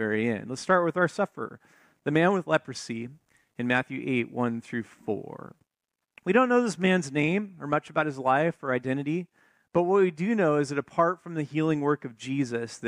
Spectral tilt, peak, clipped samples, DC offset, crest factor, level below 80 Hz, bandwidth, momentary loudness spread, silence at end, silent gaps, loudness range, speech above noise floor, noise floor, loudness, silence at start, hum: -6 dB/octave; -8 dBFS; under 0.1%; under 0.1%; 18 dB; -70 dBFS; 11 kHz; 12 LU; 0 s; none; 4 LU; 59 dB; -86 dBFS; -27 LUFS; 0 s; none